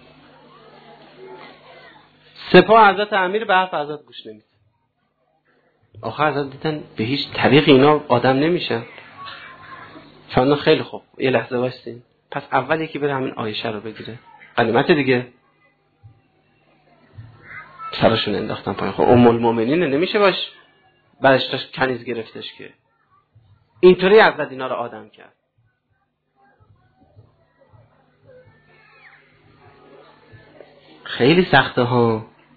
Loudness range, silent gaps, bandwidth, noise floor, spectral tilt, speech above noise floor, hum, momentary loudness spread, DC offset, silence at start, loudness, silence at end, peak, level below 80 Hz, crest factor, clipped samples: 8 LU; none; 4.8 kHz; -69 dBFS; -8.5 dB/octave; 51 dB; none; 24 LU; under 0.1%; 1.2 s; -17 LUFS; 0.3 s; 0 dBFS; -54 dBFS; 20 dB; under 0.1%